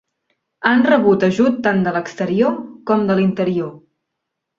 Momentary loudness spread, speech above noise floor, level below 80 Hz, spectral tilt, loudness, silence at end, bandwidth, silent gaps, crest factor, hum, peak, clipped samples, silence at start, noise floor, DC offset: 9 LU; 62 dB; -58 dBFS; -7 dB/octave; -17 LUFS; 0.8 s; 7.4 kHz; none; 18 dB; none; 0 dBFS; under 0.1%; 0.6 s; -78 dBFS; under 0.1%